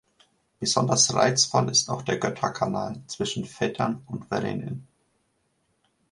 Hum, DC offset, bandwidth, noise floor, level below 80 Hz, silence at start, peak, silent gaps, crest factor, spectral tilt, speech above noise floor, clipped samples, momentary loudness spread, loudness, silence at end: none; under 0.1%; 11.5 kHz; -71 dBFS; -60 dBFS; 0.6 s; -4 dBFS; none; 24 dB; -3 dB/octave; 46 dB; under 0.1%; 13 LU; -25 LUFS; 1.3 s